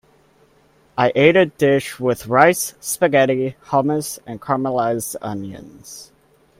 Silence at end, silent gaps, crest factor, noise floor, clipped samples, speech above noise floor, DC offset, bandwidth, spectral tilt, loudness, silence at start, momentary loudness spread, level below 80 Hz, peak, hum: 0.55 s; none; 20 dB; -55 dBFS; under 0.1%; 37 dB; under 0.1%; 16 kHz; -4.5 dB/octave; -18 LUFS; 0.95 s; 19 LU; -56 dBFS; 0 dBFS; none